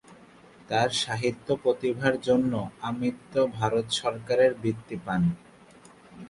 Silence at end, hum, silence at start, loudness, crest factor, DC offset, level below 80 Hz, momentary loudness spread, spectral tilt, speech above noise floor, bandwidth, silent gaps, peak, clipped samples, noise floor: 0 s; none; 0.1 s; -27 LUFS; 20 dB; under 0.1%; -58 dBFS; 8 LU; -5 dB/octave; 26 dB; 11.5 kHz; none; -8 dBFS; under 0.1%; -53 dBFS